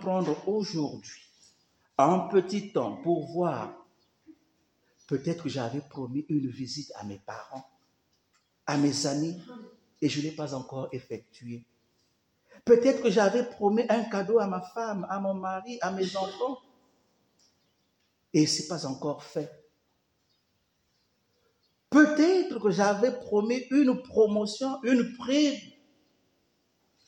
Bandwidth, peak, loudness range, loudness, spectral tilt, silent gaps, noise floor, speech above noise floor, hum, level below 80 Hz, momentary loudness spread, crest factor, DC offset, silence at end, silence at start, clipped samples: 10.5 kHz; -8 dBFS; 9 LU; -28 LUFS; -5.5 dB/octave; none; -74 dBFS; 47 dB; none; -74 dBFS; 18 LU; 22 dB; under 0.1%; 1.4 s; 0 s; under 0.1%